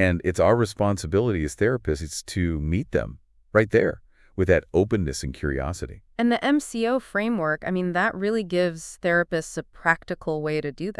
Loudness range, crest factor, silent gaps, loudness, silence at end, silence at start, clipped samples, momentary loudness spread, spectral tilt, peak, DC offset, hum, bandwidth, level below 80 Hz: 1 LU; 20 dB; none; -24 LUFS; 0.05 s; 0 s; under 0.1%; 8 LU; -6 dB/octave; -4 dBFS; under 0.1%; none; 12 kHz; -42 dBFS